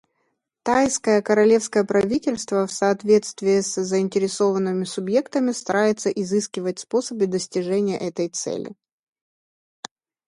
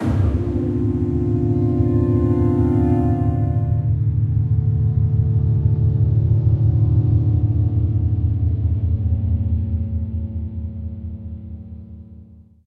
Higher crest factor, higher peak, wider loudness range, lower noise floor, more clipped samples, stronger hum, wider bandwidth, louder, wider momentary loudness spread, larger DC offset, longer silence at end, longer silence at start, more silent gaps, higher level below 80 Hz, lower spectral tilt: about the same, 16 dB vs 12 dB; about the same, -6 dBFS vs -6 dBFS; about the same, 6 LU vs 6 LU; first, -73 dBFS vs -44 dBFS; neither; neither; first, 11.5 kHz vs 2.6 kHz; second, -22 LUFS vs -19 LUFS; second, 9 LU vs 13 LU; neither; first, 1.55 s vs 0.3 s; first, 0.65 s vs 0 s; neither; second, -62 dBFS vs -28 dBFS; second, -4.5 dB/octave vs -12 dB/octave